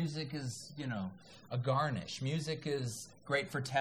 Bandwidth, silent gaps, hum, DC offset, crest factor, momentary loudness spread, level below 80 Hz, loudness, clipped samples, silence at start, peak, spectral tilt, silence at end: 14.5 kHz; none; none; under 0.1%; 20 dB; 9 LU; -72 dBFS; -38 LUFS; under 0.1%; 0 s; -18 dBFS; -5 dB/octave; 0 s